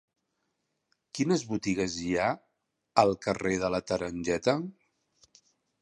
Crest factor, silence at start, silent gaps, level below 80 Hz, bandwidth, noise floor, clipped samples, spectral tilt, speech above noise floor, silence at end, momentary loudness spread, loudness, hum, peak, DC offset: 26 dB; 1.15 s; none; -58 dBFS; 11 kHz; -80 dBFS; under 0.1%; -5 dB/octave; 51 dB; 1.1 s; 7 LU; -29 LUFS; none; -6 dBFS; under 0.1%